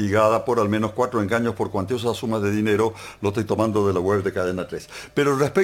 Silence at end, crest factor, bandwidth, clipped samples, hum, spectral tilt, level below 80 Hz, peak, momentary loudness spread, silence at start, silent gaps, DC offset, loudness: 0 s; 18 dB; 16.5 kHz; under 0.1%; none; -6.5 dB/octave; -54 dBFS; -4 dBFS; 7 LU; 0 s; none; under 0.1%; -22 LUFS